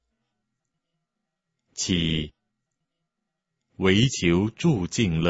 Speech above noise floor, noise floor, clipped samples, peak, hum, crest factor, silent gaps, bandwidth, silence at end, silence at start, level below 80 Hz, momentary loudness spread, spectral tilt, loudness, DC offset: 60 dB; -82 dBFS; under 0.1%; -6 dBFS; none; 22 dB; none; 8 kHz; 0 s; 1.8 s; -46 dBFS; 10 LU; -5 dB/octave; -23 LUFS; under 0.1%